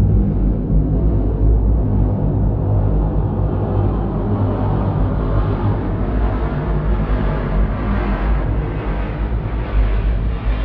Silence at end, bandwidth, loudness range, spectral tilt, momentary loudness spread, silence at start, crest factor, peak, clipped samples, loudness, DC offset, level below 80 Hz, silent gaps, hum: 0 s; 4.3 kHz; 3 LU; -11.5 dB/octave; 4 LU; 0 s; 12 dB; -4 dBFS; under 0.1%; -19 LUFS; under 0.1%; -18 dBFS; none; none